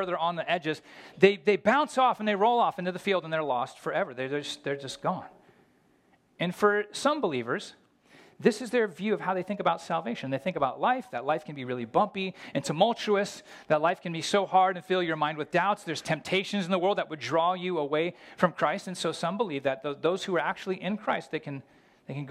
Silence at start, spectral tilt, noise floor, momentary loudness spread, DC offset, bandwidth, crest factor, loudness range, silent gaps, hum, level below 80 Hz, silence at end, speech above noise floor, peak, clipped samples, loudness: 0 s; -5 dB/octave; -65 dBFS; 9 LU; under 0.1%; 14.5 kHz; 24 dB; 5 LU; none; none; -72 dBFS; 0 s; 37 dB; -4 dBFS; under 0.1%; -28 LUFS